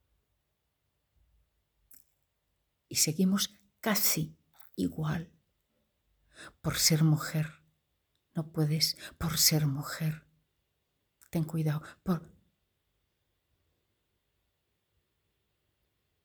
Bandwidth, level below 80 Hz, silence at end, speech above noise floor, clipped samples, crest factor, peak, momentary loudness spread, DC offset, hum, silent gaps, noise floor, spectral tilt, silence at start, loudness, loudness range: over 20 kHz; -62 dBFS; 4 s; 50 dB; under 0.1%; 26 dB; -8 dBFS; 14 LU; under 0.1%; none; none; -80 dBFS; -4 dB/octave; 2.9 s; -30 LUFS; 8 LU